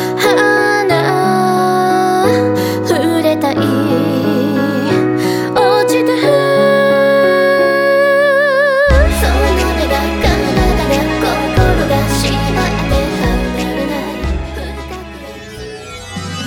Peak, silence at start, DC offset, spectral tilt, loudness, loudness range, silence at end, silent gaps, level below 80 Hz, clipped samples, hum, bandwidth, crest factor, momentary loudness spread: 0 dBFS; 0 s; under 0.1%; -5.5 dB/octave; -12 LUFS; 6 LU; 0 s; none; -22 dBFS; under 0.1%; none; 19.5 kHz; 12 dB; 13 LU